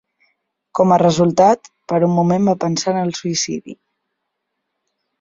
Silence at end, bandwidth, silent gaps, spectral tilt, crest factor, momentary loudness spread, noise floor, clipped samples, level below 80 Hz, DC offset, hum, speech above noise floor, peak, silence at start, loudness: 1.5 s; 7.8 kHz; none; -5.5 dB/octave; 16 dB; 9 LU; -76 dBFS; under 0.1%; -56 dBFS; under 0.1%; none; 60 dB; -2 dBFS; 0.75 s; -16 LUFS